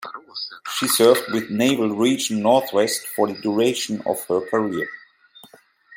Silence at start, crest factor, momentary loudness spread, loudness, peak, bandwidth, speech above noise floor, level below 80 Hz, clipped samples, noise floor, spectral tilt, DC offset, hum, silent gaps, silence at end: 0 s; 20 dB; 14 LU; -21 LUFS; -2 dBFS; 16.5 kHz; 31 dB; -70 dBFS; under 0.1%; -51 dBFS; -3.5 dB/octave; under 0.1%; none; none; 0 s